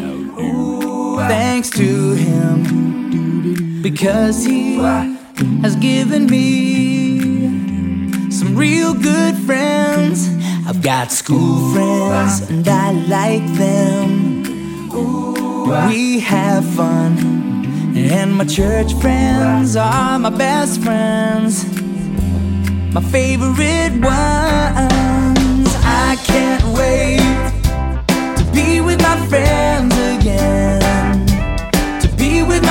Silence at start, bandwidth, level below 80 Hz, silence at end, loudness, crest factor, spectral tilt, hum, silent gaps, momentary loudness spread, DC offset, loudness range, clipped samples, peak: 0 s; 17 kHz; -24 dBFS; 0 s; -15 LUFS; 14 dB; -5.5 dB/octave; none; none; 6 LU; under 0.1%; 2 LU; under 0.1%; 0 dBFS